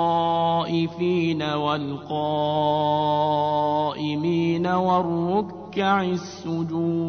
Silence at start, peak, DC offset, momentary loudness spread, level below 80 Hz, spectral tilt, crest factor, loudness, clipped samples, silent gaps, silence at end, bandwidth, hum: 0 s; -8 dBFS; under 0.1%; 6 LU; -58 dBFS; -7 dB/octave; 14 dB; -23 LUFS; under 0.1%; none; 0 s; 6.6 kHz; none